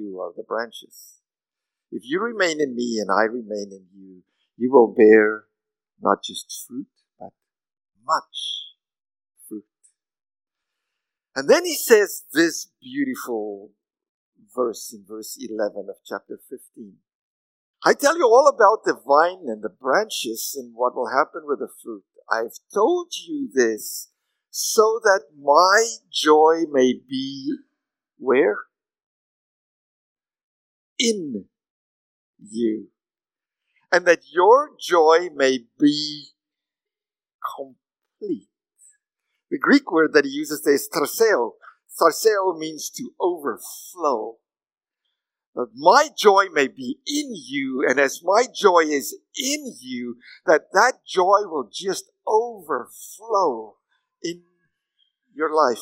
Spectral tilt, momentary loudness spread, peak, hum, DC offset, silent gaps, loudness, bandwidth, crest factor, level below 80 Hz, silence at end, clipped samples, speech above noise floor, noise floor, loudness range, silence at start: -2.5 dB/octave; 18 LU; 0 dBFS; none; under 0.1%; 14.09-14.32 s, 17.15-17.74 s, 29.06-30.16 s, 30.43-30.96 s, 31.70-32.34 s, 37.34-37.39 s, 45.47-45.53 s; -20 LUFS; 16 kHz; 22 dB; -82 dBFS; 0 s; under 0.1%; over 69 dB; under -90 dBFS; 11 LU; 0 s